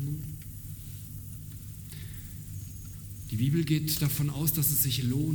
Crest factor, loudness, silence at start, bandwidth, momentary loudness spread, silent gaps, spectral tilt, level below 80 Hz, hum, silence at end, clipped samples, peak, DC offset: 20 dB; -28 LUFS; 0 s; over 20 kHz; 17 LU; none; -5 dB/octave; -48 dBFS; none; 0 s; under 0.1%; -12 dBFS; under 0.1%